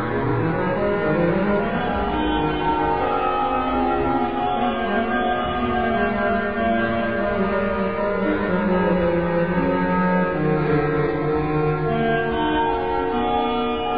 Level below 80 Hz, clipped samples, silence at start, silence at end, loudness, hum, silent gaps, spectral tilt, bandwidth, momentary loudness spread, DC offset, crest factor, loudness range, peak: -38 dBFS; under 0.1%; 0 s; 0 s; -21 LUFS; none; none; -10 dB/octave; 5.2 kHz; 2 LU; 1%; 12 dB; 1 LU; -8 dBFS